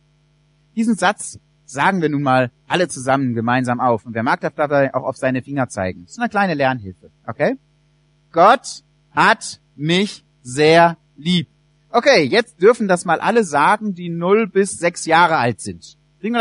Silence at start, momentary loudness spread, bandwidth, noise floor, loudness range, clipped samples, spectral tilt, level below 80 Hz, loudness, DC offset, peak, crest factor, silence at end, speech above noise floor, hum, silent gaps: 0.75 s; 16 LU; 11 kHz; -58 dBFS; 4 LU; under 0.1%; -5 dB/octave; -60 dBFS; -17 LUFS; under 0.1%; 0 dBFS; 18 dB; 0 s; 41 dB; none; none